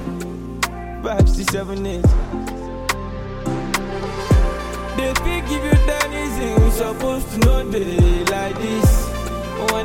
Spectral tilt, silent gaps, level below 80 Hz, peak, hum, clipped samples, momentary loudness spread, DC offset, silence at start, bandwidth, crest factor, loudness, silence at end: -5.5 dB/octave; none; -22 dBFS; -2 dBFS; none; under 0.1%; 10 LU; under 0.1%; 0 s; 17 kHz; 16 dB; -20 LUFS; 0 s